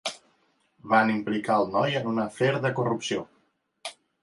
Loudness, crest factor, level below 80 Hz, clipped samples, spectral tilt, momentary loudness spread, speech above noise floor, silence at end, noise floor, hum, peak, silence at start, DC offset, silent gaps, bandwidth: -26 LUFS; 20 dB; -68 dBFS; under 0.1%; -5.5 dB/octave; 18 LU; 44 dB; 0.3 s; -70 dBFS; none; -6 dBFS; 0.05 s; under 0.1%; none; 11.5 kHz